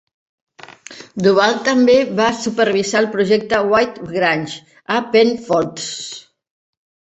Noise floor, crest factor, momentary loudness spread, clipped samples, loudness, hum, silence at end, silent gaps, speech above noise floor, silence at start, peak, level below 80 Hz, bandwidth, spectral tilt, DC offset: -39 dBFS; 16 dB; 17 LU; under 0.1%; -16 LUFS; none; 0.9 s; none; 23 dB; 0.9 s; -2 dBFS; -56 dBFS; 8.2 kHz; -4.5 dB/octave; under 0.1%